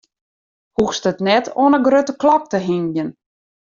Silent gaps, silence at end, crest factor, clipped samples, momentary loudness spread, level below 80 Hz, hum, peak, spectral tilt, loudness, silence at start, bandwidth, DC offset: none; 0.7 s; 16 dB; under 0.1%; 10 LU; -56 dBFS; none; -2 dBFS; -5.5 dB/octave; -17 LUFS; 0.8 s; 7.4 kHz; under 0.1%